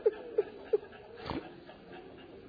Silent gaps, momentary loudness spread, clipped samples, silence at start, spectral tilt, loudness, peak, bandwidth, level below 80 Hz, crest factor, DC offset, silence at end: none; 16 LU; under 0.1%; 0 s; -4.5 dB/octave; -37 LUFS; -16 dBFS; 5 kHz; -62 dBFS; 20 dB; under 0.1%; 0 s